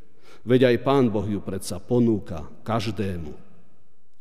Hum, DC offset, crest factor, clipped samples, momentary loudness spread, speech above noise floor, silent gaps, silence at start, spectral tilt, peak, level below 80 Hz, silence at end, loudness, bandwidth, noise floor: none; 2%; 18 dB; under 0.1%; 17 LU; 43 dB; none; 0.45 s; -7 dB/octave; -6 dBFS; -52 dBFS; 0.85 s; -23 LUFS; 15.5 kHz; -66 dBFS